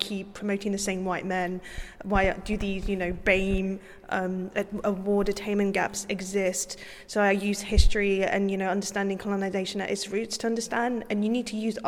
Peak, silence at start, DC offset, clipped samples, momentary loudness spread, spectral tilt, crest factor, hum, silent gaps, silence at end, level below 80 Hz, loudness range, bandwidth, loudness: -4 dBFS; 0 s; under 0.1%; under 0.1%; 7 LU; -4.5 dB/octave; 22 dB; none; none; 0 s; -36 dBFS; 2 LU; 16 kHz; -28 LUFS